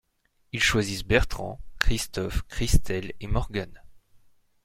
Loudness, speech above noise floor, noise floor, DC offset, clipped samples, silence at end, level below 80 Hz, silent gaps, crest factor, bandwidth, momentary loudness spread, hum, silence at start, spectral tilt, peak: -27 LUFS; 43 dB; -68 dBFS; under 0.1%; under 0.1%; 0.5 s; -32 dBFS; none; 26 dB; 16.5 kHz; 12 LU; none; 0.55 s; -4 dB/octave; -2 dBFS